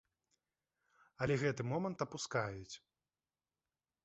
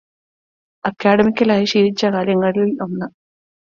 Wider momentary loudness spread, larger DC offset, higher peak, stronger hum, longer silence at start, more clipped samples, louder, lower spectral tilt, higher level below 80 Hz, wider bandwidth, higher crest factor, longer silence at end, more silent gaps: first, 15 LU vs 12 LU; neither; second, -22 dBFS vs -2 dBFS; neither; first, 1.2 s vs 0.85 s; neither; second, -39 LUFS vs -17 LUFS; about the same, -5.5 dB/octave vs -6 dB/octave; second, -70 dBFS vs -56 dBFS; about the same, 8 kHz vs 7.4 kHz; first, 22 dB vs 16 dB; first, 1.25 s vs 0.7 s; neither